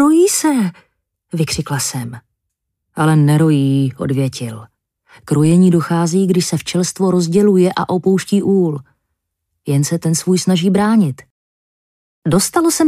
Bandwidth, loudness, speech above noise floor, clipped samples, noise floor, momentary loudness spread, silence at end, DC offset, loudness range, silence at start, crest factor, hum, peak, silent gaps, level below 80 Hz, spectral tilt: 15.5 kHz; -15 LUFS; 61 dB; under 0.1%; -75 dBFS; 13 LU; 0 s; under 0.1%; 3 LU; 0 s; 12 dB; none; -2 dBFS; 11.31-12.22 s; -52 dBFS; -6 dB/octave